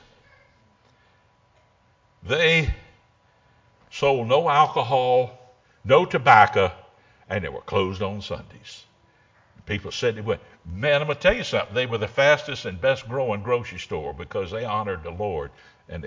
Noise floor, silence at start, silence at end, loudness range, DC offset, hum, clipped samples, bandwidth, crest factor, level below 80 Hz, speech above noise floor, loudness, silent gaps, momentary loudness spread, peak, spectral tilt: -61 dBFS; 2.25 s; 0 s; 9 LU; under 0.1%; none; under 0.1%; 7.6 kHz; 24 dB; -44 dBFS; 39 dB; -22 LUFS; none; 15 LU; 0 dBFS; -5 dB/octave